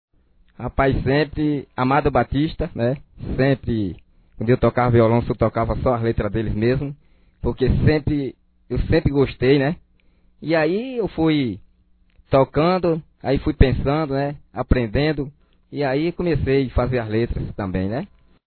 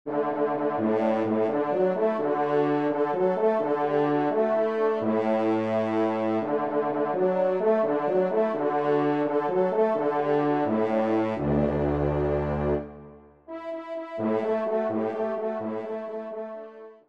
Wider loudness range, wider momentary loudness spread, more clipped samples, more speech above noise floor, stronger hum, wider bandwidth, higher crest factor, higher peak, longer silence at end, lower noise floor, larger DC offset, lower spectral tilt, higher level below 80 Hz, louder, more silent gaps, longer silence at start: second, 2 LU vs 5 LU; about the same, 11 LU vs 9 LU; neither; first, 38 dB vs 24 dB; neither; second, 4.6 kHz vs 6.4 kHz; first, 20 dB vs 14 dB; first, 0 dBFS vs -12 dBFS; first, 0.45 s vs 0.15 s; first, -57 dBFS vs -48 dBFS; second, under 0.1% vs 0.1%; first, -11 dB/octave vs -9 dB/octave; first, -32 dBFS vs -48 dBFS; first, -21 LUFS vs -26 LUFS; neither; first, 0.6 s vs 0.05 s